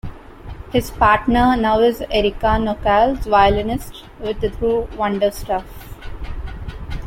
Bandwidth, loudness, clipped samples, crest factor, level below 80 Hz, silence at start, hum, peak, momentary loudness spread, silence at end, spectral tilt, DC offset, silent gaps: 16.5 kHz; -18 LUFS; under 0.1%; 16 dB; -30 dBFS; 0.05 s; none; -2 dBFS; 21 LU; 0 s; -6 dB/octave; under 0.1%; none